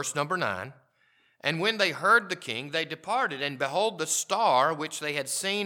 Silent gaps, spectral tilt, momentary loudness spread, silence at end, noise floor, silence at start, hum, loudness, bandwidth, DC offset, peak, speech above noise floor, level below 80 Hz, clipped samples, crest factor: none; -2.5 dB/octave; 9 LU; 0 s; -67 dBFS; 0 s; none; -27 LUFS; 18.5 kHz; under 0.1%; -8 dBFS; 39 dB; -82 dBFS; under 0.1%; 20 dB